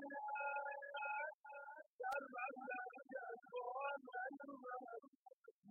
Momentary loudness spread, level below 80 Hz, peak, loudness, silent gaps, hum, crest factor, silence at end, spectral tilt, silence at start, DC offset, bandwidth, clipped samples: 12 LU; under -90 dBFS; -34 dBFS; -49 LUFS; 1.34-1.44 s, 1.86-1.99 s, 5.08-5.26 s, 5.33-5.44 s, 5.51-5.63 s; none; 16 dB; 0 s; 5 dB/octave; 0 s; under 0.1%; 3.1 kHz; under 0.1%